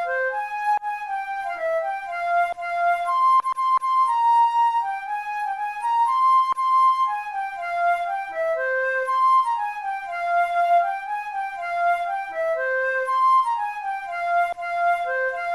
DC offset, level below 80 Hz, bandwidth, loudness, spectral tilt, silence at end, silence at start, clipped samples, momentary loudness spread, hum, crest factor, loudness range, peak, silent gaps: under 0.1%; -64 dBFS; 13 kHz; -22 LUFS; -1 dB/octave; 0 s; 0 s; under 0.1%; 10 LU; none; 10 dB; 3 LU; -12 dBFS; none